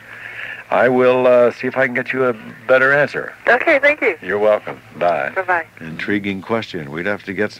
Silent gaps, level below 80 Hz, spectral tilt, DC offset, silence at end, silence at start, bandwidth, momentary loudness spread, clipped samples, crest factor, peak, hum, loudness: none; -58 dBFS; -6 dB/octave; under 0.1%; 0 s; 0.05 s; 14.5 kHz; 14 LU; under 0.1%; 14 dB; -2 dBFS; none; -16 LUFS